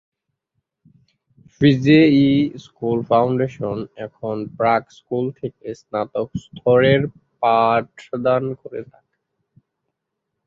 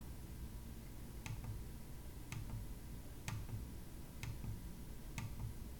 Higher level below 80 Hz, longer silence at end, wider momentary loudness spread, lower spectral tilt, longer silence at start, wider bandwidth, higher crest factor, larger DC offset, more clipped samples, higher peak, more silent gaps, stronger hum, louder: about the same, -54 dBFS vs -52 dBFS; first, 1.6 s vs 0 s; first, 17 LU vs 6 LU; first, -8 dB/octave vs -5.5 dB/octave; first, 1.6 s vs 0 s; second, 7.4 kHz vs 19 kHz; about the same, 18 dB vs 22 dB; neither; neither; first, -2 dBFS vs -26 dBFS; neither; neither; first, -19 LUFS vs -51 LUFS